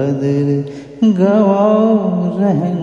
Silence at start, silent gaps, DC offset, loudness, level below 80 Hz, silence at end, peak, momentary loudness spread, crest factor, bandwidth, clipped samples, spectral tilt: 0 s; none; under 0.1%; -14 LUFS; -54 dBFS; 0 s; 0 dBFS; 6 LU; 14 dB; 7 kHz; under 0.1%; -9.5 dB/octave